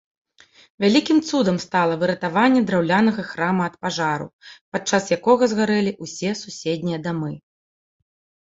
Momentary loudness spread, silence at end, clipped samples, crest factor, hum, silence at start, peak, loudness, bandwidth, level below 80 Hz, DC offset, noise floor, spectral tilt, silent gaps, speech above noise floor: 10 LU; 1.1 s; under 0.1%; 18 dB; none; 0.8 s; -2 dBFS; -21 LUFS; 7.8 kHz; -62 dBFS; under 0.1%; -53 dBFS; -5 dB/octave; 4.33-4.39 s, 4.61-4.72 s; 33 dB